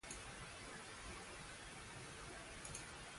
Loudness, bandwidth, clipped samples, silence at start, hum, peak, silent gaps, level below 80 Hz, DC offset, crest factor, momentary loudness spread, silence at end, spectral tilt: -52 LUFS; 11.5 kHz; under 0.1%; 0.05 s; none; -34 dBFS; none; -64 dBFS; under 0.1%; 18 dB; 2 LU; 0 s; -2.5 dB/octave